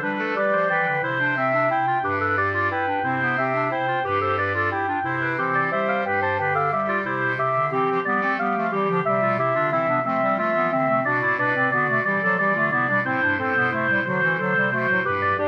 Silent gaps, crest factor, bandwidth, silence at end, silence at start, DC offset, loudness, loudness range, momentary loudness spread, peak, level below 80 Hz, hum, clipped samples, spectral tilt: none; 12 dB; 7.2 kHz; 0 s; 0 s; under 0.1%; -21 LUFS; 2 LU; 3 LU; -10 dBFS; -68 dBFS; none; under 0.1%; -8 dB/octave